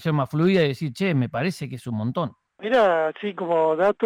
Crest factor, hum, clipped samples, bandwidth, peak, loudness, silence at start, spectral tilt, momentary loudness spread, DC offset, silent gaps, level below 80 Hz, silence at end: 12 dB; none; under 0.1%; 15.5 kHz; -10 dBFS; -23 LUFS; 0 s; -7 dB/octave; 11 LU; under 0.1%; none; -64 dBFS; 0 s